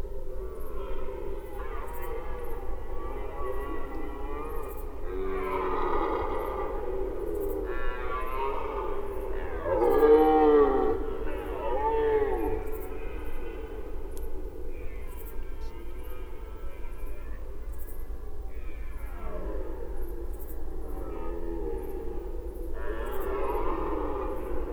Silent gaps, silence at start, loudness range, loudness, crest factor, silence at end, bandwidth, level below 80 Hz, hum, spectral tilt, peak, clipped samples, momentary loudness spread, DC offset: none; 0 s; 17 LU; -31 LUFS; 20 dB; 0 s; 18.5 kHz; -34 dBFS; none; -7.5 dB/octave; -8 dBFS; under 0.1%; 16 LU; under 0.1%